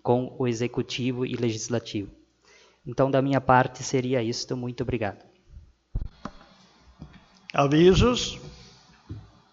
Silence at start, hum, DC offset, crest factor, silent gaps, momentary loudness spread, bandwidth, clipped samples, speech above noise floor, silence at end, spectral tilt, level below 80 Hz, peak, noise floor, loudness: 0.05 s; none; under 0.1%; 22 dB; none; 24 LU; 7.8 kHz; under 0.1%; 34 dB; 0.3 s; -5.5 dB/octave; -42 dBFS; -4 dBFS; -58 dBFS; -25 LUFS